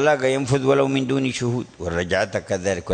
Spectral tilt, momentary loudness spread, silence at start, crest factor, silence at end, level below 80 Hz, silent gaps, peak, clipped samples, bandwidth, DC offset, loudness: -5.5 dB/octave; 7 LU; 0 s; 16 dB; 0 s; -48 dBFS; none; -4 dBFS; under 0.1%; 9.4 kHz; under 0.1%; -22 LUFS